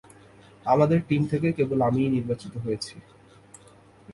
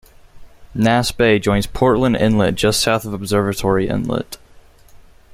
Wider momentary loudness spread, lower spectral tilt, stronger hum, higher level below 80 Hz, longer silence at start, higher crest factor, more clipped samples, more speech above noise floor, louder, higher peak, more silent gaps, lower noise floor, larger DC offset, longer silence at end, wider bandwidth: first, 11 LU vs 8 LU; first, -7.5 dB/octave vs -5 dB/octave; neither; second, -56 dBFS vs -38 dBFS; first, 0.65 s vs 0.35 s; about the same, 18 dB vs 18 dB; neither; about the same, 29 dB vs 29 dB; second, -25 LUFS vs -17 LUFS; second, -8 dBFS vs 0 dBFS; neither; first, -53 dBFS vs -45 dBFS; neither; second, 0 s vs 0.35 s; second, 11.5 kHz vs 16 kHz